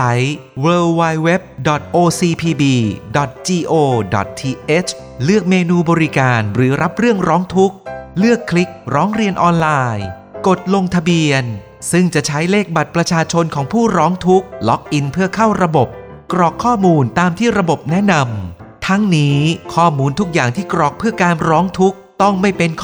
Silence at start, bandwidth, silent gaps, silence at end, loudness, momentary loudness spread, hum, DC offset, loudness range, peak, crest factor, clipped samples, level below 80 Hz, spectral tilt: 0 s; 20 kHz; none; 0 s; -15 LUFS; 6 LU; none; under 0.1%; 1 LU; 0 dBFS; 14 dB; under 0.1%; -44 dBFS; -6 dB/octave